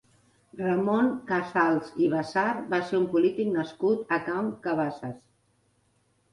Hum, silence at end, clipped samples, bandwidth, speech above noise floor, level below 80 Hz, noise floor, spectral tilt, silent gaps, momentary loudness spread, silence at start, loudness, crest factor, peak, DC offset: none; 1.15 s; under 0.1%; 11 kHz; 42 dB; -70 dBFS; -69 dBFS; -7 dB/octave; none; 6 LU; 0.55 s; -27 LUFS; 18 dB; -10 dBFS; under 0.1%